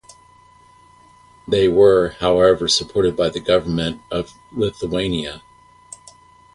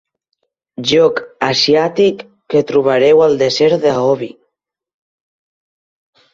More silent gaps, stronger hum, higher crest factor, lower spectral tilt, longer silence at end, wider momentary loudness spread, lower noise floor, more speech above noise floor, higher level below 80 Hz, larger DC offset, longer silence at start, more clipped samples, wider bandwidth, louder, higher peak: neither; neither; about the same, 18 dB vs 14 dB; about the same, -4.5 dB/octave vs -4.5 dB/octave; second, 1.15 s vs 2.05 s; first, 18 LU vs 10 LU; second, -50 dBFS vs -74 dBFS; second, 32 dB vs 62 dB; first, -44 dBFS vs -56 dBFS; neither; first, 1.5 s vs 0.8 s; neither; first, 11.5 kHz vs 7.6 kHz; second, -18 LUFS vs -13 LUFS; about the same, -2 dBFS vs 0 dBFS